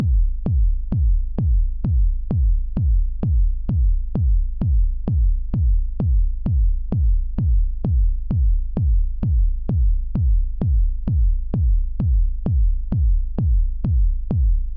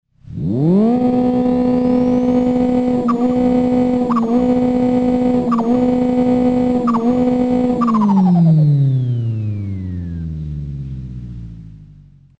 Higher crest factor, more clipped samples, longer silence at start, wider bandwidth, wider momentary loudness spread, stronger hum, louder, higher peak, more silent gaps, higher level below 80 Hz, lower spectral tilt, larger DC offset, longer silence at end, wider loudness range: about the same, 8 dB vs 10 dB; neither; second, 0 s vs 0.25 s; second, 1.4 kHz vs 7.6 kHz; second, 1 LU vs 13 LU; neither; second, -22 LUFS vs -15 LUFS; second, -10 dBFS vs -4 dBFS; neither; first, -18 dBFS vs -38 dBFS; first, -13 dB/octave vs -10 dB/octave; neither; second, 0 s vs 0.5 s; second, 0 LU vs 4 LU